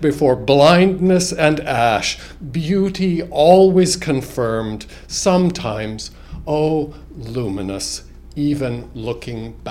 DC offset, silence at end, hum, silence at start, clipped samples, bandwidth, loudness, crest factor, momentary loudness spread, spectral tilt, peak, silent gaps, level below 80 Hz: under 0.1%; 0 s; none; 0 s; under 0.1%; 15.5 kHz; -17 LUFS; 18 dB; 18 LU; -5 dB/octave; 0 dBFS; none; -38 dBFS